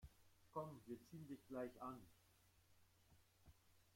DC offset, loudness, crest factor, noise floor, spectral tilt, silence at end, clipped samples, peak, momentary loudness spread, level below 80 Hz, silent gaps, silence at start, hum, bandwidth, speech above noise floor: under 0.1%; -55 LUFS; 22 dB; -76 dBFS; -7 dB/octave; 0 s; under 0.1%; -36 dBFS; 7 LU; -78 dBFS; none; 0 s; none; 16.5 kHz; 21 dB